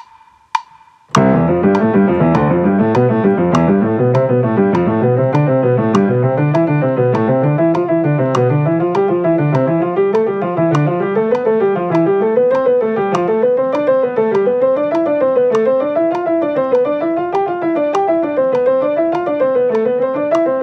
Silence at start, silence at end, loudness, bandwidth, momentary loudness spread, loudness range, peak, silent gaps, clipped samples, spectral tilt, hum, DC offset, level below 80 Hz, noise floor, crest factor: 0.55 s; 0 s; -14 LUFS; 8.6 kHz; 3 LU; 2 LU; 0 dBFS; none; under 0.1%; -8.5 dB/octave; none; under 0.1%; -50 dBFS; -46 dBFS; 14 dB